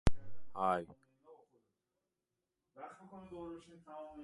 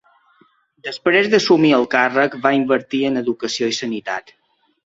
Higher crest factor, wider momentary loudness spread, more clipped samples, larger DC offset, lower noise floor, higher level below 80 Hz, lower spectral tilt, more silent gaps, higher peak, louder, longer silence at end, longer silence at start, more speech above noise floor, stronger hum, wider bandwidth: first, 28 dB vs 18 dB; first, 19 LU vs 12 LU; neither; neither; first, -89 dBFS vs -57 dBFS; first, -50 dBFS vs -62 dBFS; first, -6.5 dB/octave vs -4.5 dB/octave; neither; second, -12 dBFS vs -2 dBFS; second, -42 LUFS vs -17 LUFS; second, 0 s vs 0.65 s; second, 0.05 s vs 0.85 s; first, 48 dB vs 40 dB; neither; first, 11 kHz vs 8 kHz